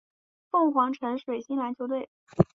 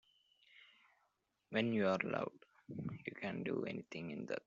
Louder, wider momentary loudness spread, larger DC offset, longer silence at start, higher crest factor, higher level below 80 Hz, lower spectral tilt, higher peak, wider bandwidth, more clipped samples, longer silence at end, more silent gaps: first, -28 LUFS vs -41 LUFS; second, 9 LU vs 12 LU; neither; about the same, 0.55 s vs 0.55 s; about the same, 22 dB vs 22 dB; first, -58 dBFS vs -78 dBFS; first, -9 dB/octave vs -5 dB/octave; first, -6 dBFS vs -20 dBFS; about the same, 7.4 kHz vs 7.4 kHz; neither; about the same, 0.1 s vs 0.05 s; first, 2.08-2.27 s vs none